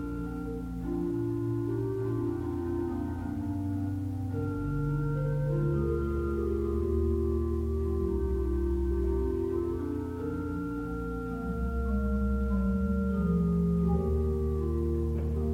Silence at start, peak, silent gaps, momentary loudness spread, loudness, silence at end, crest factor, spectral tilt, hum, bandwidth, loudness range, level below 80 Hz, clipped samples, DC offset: 0 s; -16 dBFS; none; 6 LU; -31 LUFS; 0 s; 12 dB; -10 dB/octave; none; 10.5 kHz; 4 LU; -36 dBFS; under 0.1%; under 0.1%